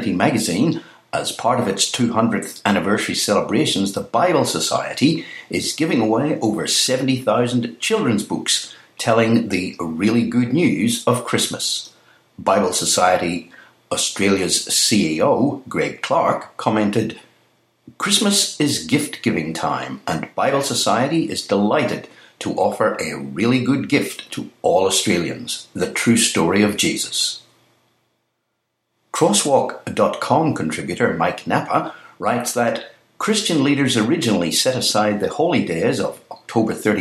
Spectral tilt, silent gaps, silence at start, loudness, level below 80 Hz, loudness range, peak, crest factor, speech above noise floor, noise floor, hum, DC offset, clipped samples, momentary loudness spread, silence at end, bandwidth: -3.5 dB/octave; none; 0 s; -19 LUFS; -58 dBFS; 2 LU; 0 dBFS; 18 dB; 55 dB; -73 dBFS; none; under 0.1%; under 0.1%; 9 LU; 0 s; 16 kHz